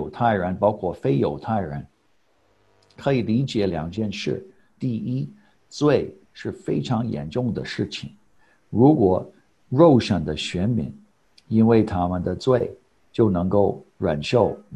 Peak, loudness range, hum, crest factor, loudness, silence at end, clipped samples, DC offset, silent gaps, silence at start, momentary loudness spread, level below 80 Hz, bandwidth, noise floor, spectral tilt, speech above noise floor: -2 dBFS; 6 LU; none; 20 dB; -22 LUFS; 0 s; under 0.1%; under 0.1%; none; 0 s; 15 LU; -46 dBFS; 9.6 kHz; -65 dBFS; -7.5 dB/octave; 44 dB